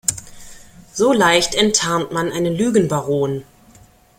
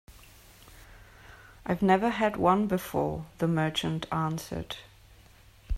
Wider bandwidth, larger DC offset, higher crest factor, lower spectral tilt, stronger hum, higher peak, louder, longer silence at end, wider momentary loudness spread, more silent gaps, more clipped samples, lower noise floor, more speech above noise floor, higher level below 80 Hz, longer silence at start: about the same, 16.5 kHz vs 16 kHz; neither; about the same, 18 dB vs 22 dB; second, -3.5 dB/octave vs -6 dB/octave; neither; first, 0 dBFS vs -8 dBFS; first, -17 LUFS vs -28 LUFS; first, 0.75 s vs 0 s; second, 10 LU vs 13 LU; neither; neither; second, -48 dBFS vs -56 dBFS; first, 32 dB vs 28 dB; about the same, -48 dBFS vs -46 dBFS; about the same, 0.1 s vs 0.1 s